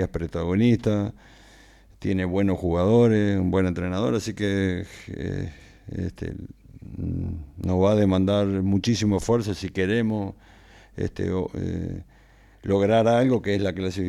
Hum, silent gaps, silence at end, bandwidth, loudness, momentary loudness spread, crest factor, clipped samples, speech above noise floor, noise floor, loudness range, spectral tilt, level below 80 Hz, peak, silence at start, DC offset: none; none; 0 s; 12.5 kHz; -24 LUFS; 15 LU; 16 dB; under 0.1%; 30 dB; -53 dBFS; 6 LU; -7 dB/octave; -48 dBFS; -8 dBFS; 0 s; under 0.1%